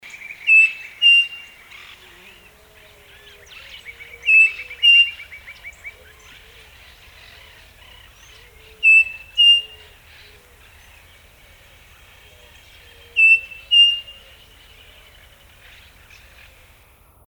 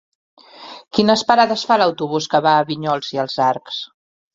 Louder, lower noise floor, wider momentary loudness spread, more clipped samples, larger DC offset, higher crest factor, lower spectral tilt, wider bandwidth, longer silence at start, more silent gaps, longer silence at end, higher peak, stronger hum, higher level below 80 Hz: first, -13 LUFS vs -17 LUFS; first, -51 dBFS vs -39 dBFS; first, 26 LU vs 14 LU; neither; neither; about the same, 16 dB vs 18 dB; second, 1.5 dB/octave vs -4.5 dB/octave; first, over 20 kHz vs 7.8 kHz; second, 0.25 s vs 0.6 s; neither; first, 3.25 s vs 0.5 s; second, -4 dBFS vs 0 dBFS; neither; first, -54 dBFS vs -60 dBFS